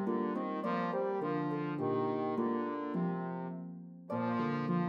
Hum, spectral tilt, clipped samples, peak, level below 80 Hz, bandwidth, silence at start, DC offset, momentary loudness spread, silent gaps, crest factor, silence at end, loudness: none; -9.5 dB/octave; under 0.1%; -22 dBFS; -88 dBFS; 6 kHz; 0 s; under 0.1%; 7 LU; none; 14 dB; 0 s; -36 LUFS